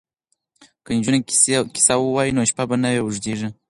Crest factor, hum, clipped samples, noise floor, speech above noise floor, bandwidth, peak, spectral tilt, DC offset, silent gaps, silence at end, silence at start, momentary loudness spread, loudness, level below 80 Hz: 20 dB; none; under 0.1%; -72 dBFS; 53 dB; 11.5 kHz; -2 dBFS; -3.5 dB/octave; under 0.1%; none; 0.15 s; 0.9 s; 9 LU; -18 LUFS; -54 dBFS